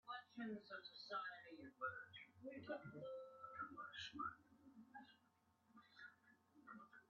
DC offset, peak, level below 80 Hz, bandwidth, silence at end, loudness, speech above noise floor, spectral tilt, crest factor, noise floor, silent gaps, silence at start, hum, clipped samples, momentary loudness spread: under 0.1%; -36 dBFS; -90 dBFS; 6.8 kHz; 0.05 s; -54 LUFS; 26 dB; -2 dB/octave; 20 dB; -80 dBFS; none; 0.05 s; none; under 0.1%; 14 LU